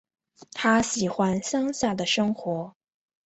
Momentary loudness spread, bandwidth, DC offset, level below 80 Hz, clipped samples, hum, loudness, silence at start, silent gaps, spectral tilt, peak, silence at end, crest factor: 10 LU; 8.2 kHz; under 0.1%; -58 dBFS; under 0.1%; none; -25 LUFS; 0.55 s; none; -4 dB/octave; -8 dBFS; 0.55 s; 18 dB